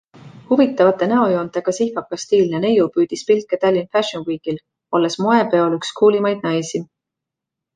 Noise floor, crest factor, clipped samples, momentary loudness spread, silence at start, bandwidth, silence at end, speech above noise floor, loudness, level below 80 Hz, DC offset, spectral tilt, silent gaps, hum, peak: -83 dBFS; 16 dB; under 0.1%; 10 LU; 0.25 s; 9.6 kHz; 0.9 s; 66 dB; -18 LUFS; -62 dBFS; under 0.1%; -5.5 dB/octave; none; none; -2 dBFS